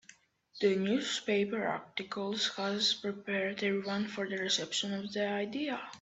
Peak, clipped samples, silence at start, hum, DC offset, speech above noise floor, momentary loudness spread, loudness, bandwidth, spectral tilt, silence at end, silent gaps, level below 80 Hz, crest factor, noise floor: -16 dBFS; under 0.1%; 0.1 s; none; under 0.1%; 28 dB; 6 LU; -33 LUFS; 8.4 kHz; -3.5 dB/octave; 0 s; none; -76 dBFS; 18 dB; -62 dBFS